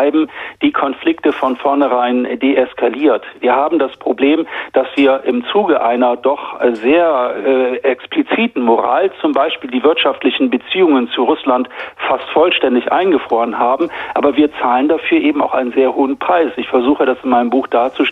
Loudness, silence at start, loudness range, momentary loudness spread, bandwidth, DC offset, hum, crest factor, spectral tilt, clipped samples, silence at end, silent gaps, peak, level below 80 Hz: -14 LUFS; 0 s; 1 LU; 4 LU; 5.2 kHz; under 0.1%; none; 14 dB; -6.5 dB/octave; under 0.1%; 0 s; none; 0 dBFS; -58 dBFS